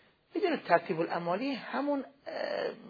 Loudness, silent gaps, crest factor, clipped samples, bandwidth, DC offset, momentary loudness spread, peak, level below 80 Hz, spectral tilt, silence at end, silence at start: -33 LUFS; none; 24 dB; under 0.1%; 5 kHz; under 0.1%; 9 LU; -10 dBFS; -82 dBFS; -7.5 dB/octave; 0 s; 0.35 s